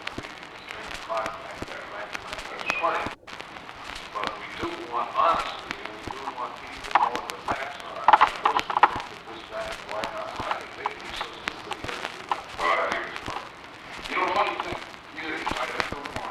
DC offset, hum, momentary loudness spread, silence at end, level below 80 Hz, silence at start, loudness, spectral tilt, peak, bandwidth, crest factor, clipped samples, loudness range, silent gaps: under 0.1%; none; 15 LU; 0 s; -54 dBFS; 0 s; -28 LUFS; -3 dB/octave; -2 dBFS; 14 kHz; 26 dB; under 0.1%; 7 LU; none